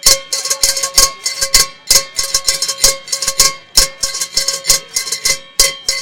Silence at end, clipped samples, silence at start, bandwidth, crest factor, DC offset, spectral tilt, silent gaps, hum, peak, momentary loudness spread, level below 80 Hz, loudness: 0 s; 0.5%; 0 s; over 20 kHz; 14 dB; 3%; 1.5 dB/octave; none; none; 0 dBFS; 5 LU; -32 dBFS; -12 LUFS